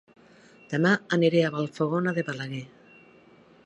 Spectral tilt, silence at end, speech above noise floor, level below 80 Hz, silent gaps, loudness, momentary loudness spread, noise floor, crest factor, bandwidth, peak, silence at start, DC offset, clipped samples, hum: -6.5 dB/octave; 1 s; 30 dB; -74 dBFS; none; -26 LUFS; 13 LU; -55 dBFS; 18 dB; 8.8 kHz; -8 dBFS; 0.7 s; under 0.1%; under 0.1%; none